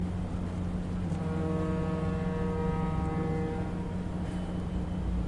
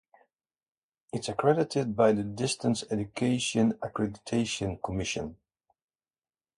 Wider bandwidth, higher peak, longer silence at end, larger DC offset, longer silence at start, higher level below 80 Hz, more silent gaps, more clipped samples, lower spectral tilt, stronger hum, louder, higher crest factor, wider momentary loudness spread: about the same, 11 kHz vs 11.5 kHz; second, -18 dBFS vs -10 dBFS; second, 0 s vs 1.25 s; neither; second, 0 s vs 1.15 s; first, -40 dBFS vs -56 dBFS; neither; neither; first, -8.5 dB/octave vs -5 dB/octave; neither; second, -33 LUFS vs -29 LUFS; second, 12 dB vs 20 dB; second, 4 LU vs 8 LU